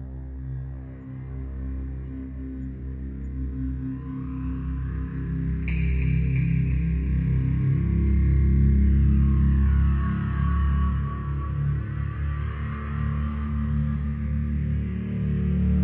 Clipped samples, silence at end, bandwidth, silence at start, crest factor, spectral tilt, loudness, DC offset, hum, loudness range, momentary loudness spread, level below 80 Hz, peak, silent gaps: under 0.1%; 0 s; 3.3 kHz; 0 s; 12 dB; -12 dB/octave; -26 LUFS; under 0.1%; none; 11 LU; 14 LU; -28 dBFS; -12 dBFS; none